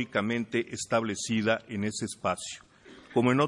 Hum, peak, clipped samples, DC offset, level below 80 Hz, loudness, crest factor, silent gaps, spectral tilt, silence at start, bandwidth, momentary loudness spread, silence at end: none; -10 dBFS; under 0.1%; under 0.1%; -68 dBFS; -30 LUFS; 18 dB; none; -4.5 dB/octave; 0 s; 11.5 kHz; 6 LU; 0 s